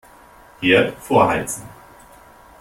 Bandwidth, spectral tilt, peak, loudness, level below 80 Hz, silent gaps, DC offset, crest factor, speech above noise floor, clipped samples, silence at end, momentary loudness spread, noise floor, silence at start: 16.5 kHz; -4.5 dB/octave; -2 dBFS; -18 LUFS; -50 dBFS; none; under 0.1%; 18 dB; 29 dB; under 0.1%; 0.9 s; 12 LU; -46 dBFS; 0.6 s